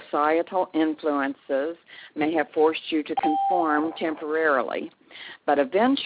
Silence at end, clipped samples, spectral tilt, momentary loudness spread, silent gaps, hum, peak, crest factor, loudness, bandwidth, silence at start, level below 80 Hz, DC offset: 0 s; under 0.1%; -8 dB/octave; 11 LU; none; none; -8 dBFS; 16 dB; -25 LUFS; 4 kHz; 0 s; -72 dBFS; under 0.1%